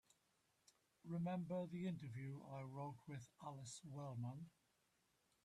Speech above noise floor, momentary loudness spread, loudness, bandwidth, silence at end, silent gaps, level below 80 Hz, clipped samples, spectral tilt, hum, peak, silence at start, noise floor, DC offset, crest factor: 33 dB; 10 LU; -51 LUFS; 12.5 kHz; 0.95 s; none; -84 dBFS; under 0.1%; -7 dB/octave; none; -38 dBFS; 1.05 s; -83 dBFS; under 0.1%; 14 dB